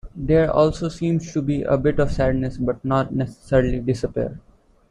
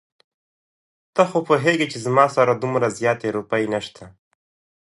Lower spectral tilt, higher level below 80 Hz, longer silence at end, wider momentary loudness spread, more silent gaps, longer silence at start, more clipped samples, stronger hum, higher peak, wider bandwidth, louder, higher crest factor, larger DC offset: first, -7.5 dB/octave vs -5.5 dB/octave; first, -34 dBFS vs -64 dBFS; second, 0.5 s vs 0.75 s; about the same, 7 LU vs 8 LU; neither; second, 0.05 s vs 1.15 s; neither; neither; about the same, -4 dBFS vs -2 dBFS; about the same, 10.5 kHz vs 11.5 kHz; about the same, -21 LUFS vs -20 LUFS; about the same, 18 dB vs 20 dB; neither